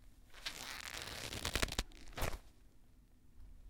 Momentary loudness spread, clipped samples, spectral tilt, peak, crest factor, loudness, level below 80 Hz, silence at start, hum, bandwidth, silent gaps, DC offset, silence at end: 15 LU; under 0.1%; -2.5 dB/octave; -14 dBFS; 30 dB; -43 LUFS; -50 dBFS; 0 s; none; 18 kHz; none; under 0.1%; 0 s